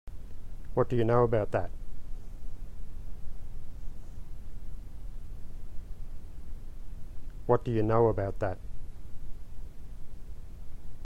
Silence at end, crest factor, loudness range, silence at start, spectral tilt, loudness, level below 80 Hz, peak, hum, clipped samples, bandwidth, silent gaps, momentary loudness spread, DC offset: 0 s; 20 dB; 16 LU; 0.05 s; -9 dB/octave; -29 LUFS; -40 dBFS; -10 dBFS; none; under 0.1%; 5 kHz; none; 23 LU; under 0.1%